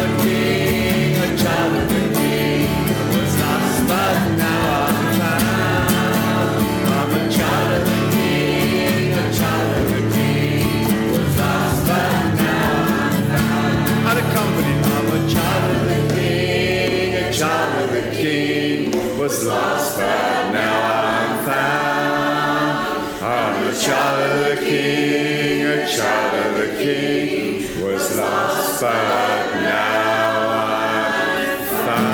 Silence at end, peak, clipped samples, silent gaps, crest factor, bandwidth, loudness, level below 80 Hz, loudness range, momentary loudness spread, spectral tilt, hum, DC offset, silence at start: 0 s; -2 dBFS; under 0.1%; none; 16 dB; over 20 kHz; -18 LUFS; -40 dBFS; 2 LU; 2 LU; -5 dB/octave; none; under 0.1%; 0 s